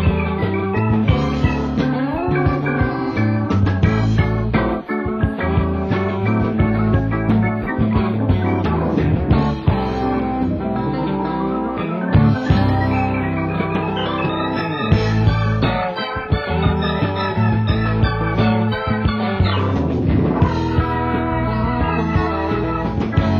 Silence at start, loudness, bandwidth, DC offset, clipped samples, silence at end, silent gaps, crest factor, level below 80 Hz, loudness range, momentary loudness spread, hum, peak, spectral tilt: 0 s; -19 LUFS; 7 kHz; under 0.1%; under 0.1%; 0 s; none; 16 dB; -28 dBFS; 1 LU; 4 LU; none; -2 dBFS; -8.5 dB/octave